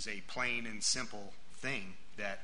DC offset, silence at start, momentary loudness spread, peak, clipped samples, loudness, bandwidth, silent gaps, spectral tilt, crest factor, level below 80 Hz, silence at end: 1%; 0 s; 17 LU; -20 dBFS; under 0.1%; -37 LUFS; 10.5 kHz; none; -1.5 dB/octave; 20 dB; -64 dBFS; 0 s